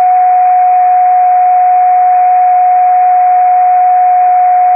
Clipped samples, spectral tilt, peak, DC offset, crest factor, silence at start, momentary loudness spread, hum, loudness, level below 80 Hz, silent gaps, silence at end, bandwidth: under 0.1%; -8.5 dB/octave; -2 dBFS; under 0.1%; 4 dB; 0 s; 0 LU; none; -7 LUFS; under -90 dBFS; none; 0 s; 2.7 kHz